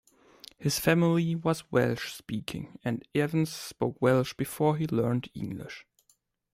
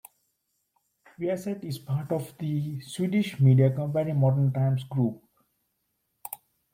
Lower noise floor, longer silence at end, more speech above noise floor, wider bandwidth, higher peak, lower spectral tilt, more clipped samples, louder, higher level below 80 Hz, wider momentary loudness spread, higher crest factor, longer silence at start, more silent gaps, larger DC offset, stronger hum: second, -70 dBFS vs -77 dBFS; first, 0.75 s vs 0.4 s; second, 42 dB vs 52 dB; about the same, 16 kHz vs 16.5 kHz; first, -8 dBFS vs -12 dBFS; second, -6 dB/octave vs -8 dB/octave; neither; about the same, -29 LUFS vs -27 LUFS; about the same, -62 dBFS vs -66 dBFS; second, 13 LU vs 19 LU; first, 22 dB vs 16 dB; second, 0.6 s vs 1.2 s; neither; neither; neither